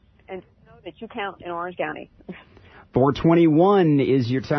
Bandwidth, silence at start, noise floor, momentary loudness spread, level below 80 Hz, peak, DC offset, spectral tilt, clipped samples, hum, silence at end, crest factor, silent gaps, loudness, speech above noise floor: 6.2 kHz; 0.3 s; -49 dBFS; 23 LU; -52 dBFS; -6 dBFS; under 0.1%; -9 dB/octave; under 0.1%; none; 0 s; 16 dB; none; -20 LUFS; 29 dB